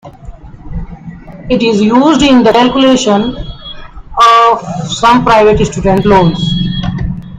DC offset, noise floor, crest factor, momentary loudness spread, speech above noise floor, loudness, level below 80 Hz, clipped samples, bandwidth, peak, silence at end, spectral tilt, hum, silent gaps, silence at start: under 0.1%; -29 dBFS; 10 dB; 20 LU; 22 dB; -9 LUFS; -28 dBFS; 0.5%; 10.5 kHz; 0 dBFS; 0 s; -5.5 dB/octave; none; none; 0.05 s